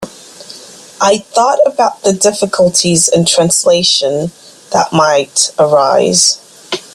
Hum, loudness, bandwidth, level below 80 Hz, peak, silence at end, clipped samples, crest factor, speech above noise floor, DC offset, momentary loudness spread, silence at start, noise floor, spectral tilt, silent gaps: none; -10 LUFS; 15.5 kHz; -52 dBFS; 0 dBFS; 0.15 s; under 0.1%; 12 dB; 23 dB; under 0.1%; 13 LU; 0 s; -34 dBFS; -3 dB/octave; none